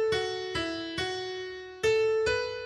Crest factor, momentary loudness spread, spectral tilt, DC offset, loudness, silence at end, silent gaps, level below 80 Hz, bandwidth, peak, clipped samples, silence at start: 14 dB; 10 LU; -3.5 dB/octave; under 0.1%; -30 LUFS; 0 s; none; -54 dBFS; 12 kHz; -16 dBFS; under 0.1%; 0 s